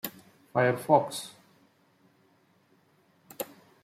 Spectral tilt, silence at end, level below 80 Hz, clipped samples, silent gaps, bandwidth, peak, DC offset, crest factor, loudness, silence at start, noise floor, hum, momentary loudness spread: -5 dB/octave; 0.4 s; -76 dBFS; under 0.1%; none; 16.5 kHz; -8 dBFS; under 0.1%; 24 dB; -29 LUFS; 0.05 s; -66 dBFS; none; 16 LU